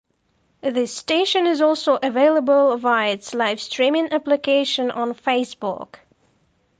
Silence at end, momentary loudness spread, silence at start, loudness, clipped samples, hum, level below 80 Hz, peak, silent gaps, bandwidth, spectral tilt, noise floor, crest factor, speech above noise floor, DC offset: 0.95 s; 9 LU; 0.65 s; -20 LUFS; under 0.1%; none; -70 dBFS; -6 dBFS; none; 9.6 kHz; -3 dB/octave; -66 dBFS; 14 dB; 46 dB; under 0.1%